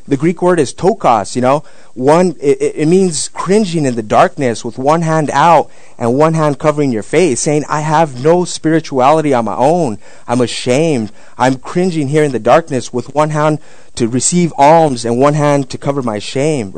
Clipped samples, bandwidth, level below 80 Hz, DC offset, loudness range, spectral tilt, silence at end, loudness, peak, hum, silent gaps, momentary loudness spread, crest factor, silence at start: 0.9%; 12 kHz; -48 dBFS; 4%; 2 LU; -5.5 dB/octave; 0 s; -13 LUFS; 0 dBFS; none; none; 8 LU; 12 dB; 0.1 s